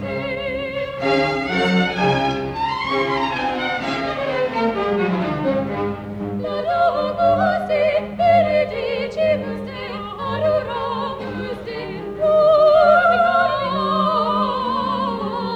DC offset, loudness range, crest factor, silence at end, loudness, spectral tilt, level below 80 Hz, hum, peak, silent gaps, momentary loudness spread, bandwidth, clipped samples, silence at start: under 0.1%; 6 LU; 16 dB; 0 s; -19 LUFS; -6.5 dB/octave; -46 dBFS; none; -4 dBFS; none; 13 LU; 9.4 kHz; under 0.1%; 0 s